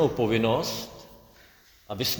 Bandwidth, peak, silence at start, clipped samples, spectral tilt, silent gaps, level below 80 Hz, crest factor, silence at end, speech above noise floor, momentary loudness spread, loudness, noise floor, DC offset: over 20 kHz; -10 dBFS; 0 s; under 0.1%; -4.5 dB/octave; none; -54 dBFS; 18 dB; 0 s; 30 dB; 18 LU; -26 LUFS; -56 dBFS; under 0.1%